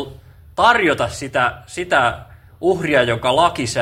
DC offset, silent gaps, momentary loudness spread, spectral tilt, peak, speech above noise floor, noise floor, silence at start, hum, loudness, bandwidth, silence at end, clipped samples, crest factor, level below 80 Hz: under 0.1%; none; 13 LU; -4 dB/octave; 0 dBFS; 23 dB; -40 dBFS; 0 s; none; -17 LUFS; 16 kHz; 0 s; under 0.1%; 18 dB; -44 dBFS